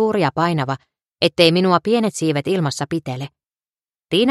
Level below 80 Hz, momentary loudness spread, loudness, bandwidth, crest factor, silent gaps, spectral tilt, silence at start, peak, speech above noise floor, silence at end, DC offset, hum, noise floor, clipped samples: -58 dBFS; 14 LU; -18 LUFS; 13.5 kHz; 18 dB; 3.69-3.73 s; -5.5 dB/octave; 0 s; 0 dBFS; over 72 dB; 0 s; under 0.1%; none; under -90 dBFS; under 0.1%